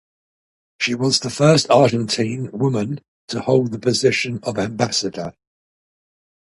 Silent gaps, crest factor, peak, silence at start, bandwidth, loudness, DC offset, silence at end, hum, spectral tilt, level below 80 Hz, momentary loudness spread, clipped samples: 3.08-3.28 s; 20 dB; 0 dBFS; 0.8 s; 11.5 kHz; -19 LUFS; under 0.1%; 1.15 s; none; -4.5 dB/octave; -56 dBFS; 12 LU; under 0.1%